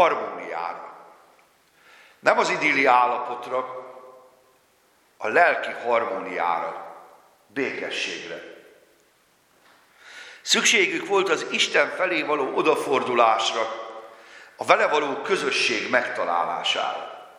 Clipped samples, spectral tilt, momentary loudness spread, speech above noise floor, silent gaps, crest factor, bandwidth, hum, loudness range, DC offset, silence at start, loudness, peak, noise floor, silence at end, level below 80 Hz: under 0.1%; -1.5 dB/octave; 17 LU; 39 dB; none; 24 dB; 16 kHz; none; 9 LU; under 0.1%; 0 s; -22 LUFS; 0 dBFS; -62 dBFS; 0.1 s; -80 dBFS